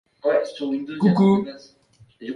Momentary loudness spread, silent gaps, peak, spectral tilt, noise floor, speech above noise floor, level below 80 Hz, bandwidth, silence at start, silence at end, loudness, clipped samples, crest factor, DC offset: 14 LU; none; -6 dBFS; -8.5 dB/octave; -50 dBFS; 30 dB; -64 dBFS; 10 kHz; 0.25 s; 0 s; -21 LUFS; under 0.1%; 16 dB; under 0.1%